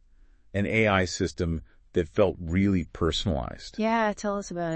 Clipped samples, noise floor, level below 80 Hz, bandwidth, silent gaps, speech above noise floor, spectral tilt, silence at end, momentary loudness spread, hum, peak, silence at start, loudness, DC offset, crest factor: under 0.1%; -56 dBFS; -44 dBFS; 8.6 kHz; none; 30 dB; -5.5 dB/octave; 0 s; 8 LU; none; -8 dBFS; 0.55 s; -27 LUFS; under 0.1%; 18 dB